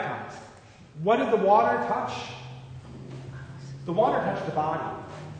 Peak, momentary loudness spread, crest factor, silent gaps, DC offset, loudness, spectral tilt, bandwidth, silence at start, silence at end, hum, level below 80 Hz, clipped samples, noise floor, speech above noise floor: -8 dBFS; 21 LU; 20 dB; none; under 0.1%; -26 LUFS; -6.5 dB/octave; 9.4 kHz; 0 s; 0 s; none; -60 dBFS; under 0.1%; -50 dBFS; 25 dB